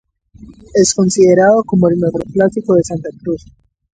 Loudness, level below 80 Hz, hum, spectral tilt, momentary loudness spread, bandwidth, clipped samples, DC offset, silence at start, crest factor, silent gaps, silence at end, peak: -13 LUFS; -44 dBFS; none; -5.5 dB/octave; 13 LU; 9.4 kHz; under 0.1%; under 0.1%; 0.45 s; 14 dB; none; 0.6 s; 0 dBFS